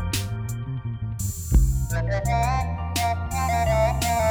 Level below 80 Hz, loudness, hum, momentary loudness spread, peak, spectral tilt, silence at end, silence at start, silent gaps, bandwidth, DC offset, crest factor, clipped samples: -28 dBFS; -25 LUFS; none; 9 LU; -6 dBFS; -5 dB/octave; 0 s; 0 s; none; over 20 kHz; under 0.1%; 16 dB; under 0.1%